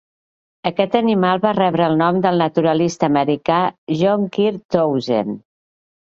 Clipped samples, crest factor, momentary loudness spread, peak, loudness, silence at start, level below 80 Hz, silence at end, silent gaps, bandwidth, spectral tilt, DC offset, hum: under 0.1%; 16 dB; 5 LU; -2 dBFS; -17 LUFS; 0.65 s; -58 dBFS; 0.65 s; 3.78-3.87 s, 4.65-4.69 s; 7.8 kHz; -6.5 dB/octave; under 0.1%; none